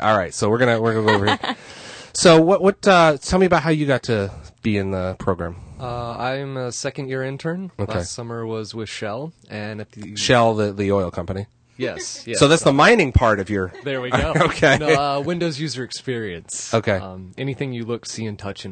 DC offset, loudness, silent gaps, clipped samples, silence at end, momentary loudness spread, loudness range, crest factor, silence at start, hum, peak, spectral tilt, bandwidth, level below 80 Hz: under 0.1%; -20 LUFS; none; under 0.1%; 0 s; 16 LU; 10 LU; 18 dB; 0 s; none; -2 dBFS; -5 dB/octave; 9.4 kHz; -40 dBFS